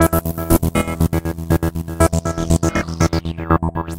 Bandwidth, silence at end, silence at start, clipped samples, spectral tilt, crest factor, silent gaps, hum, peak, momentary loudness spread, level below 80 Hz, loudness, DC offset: 16.5 kHz; 0 s; 0 s; under 0.1%; -6 dB/octave; 18 dB; none; none; 0 dBFS; 4 LU; -26 dBFS; -19 LUFS; under 0.1%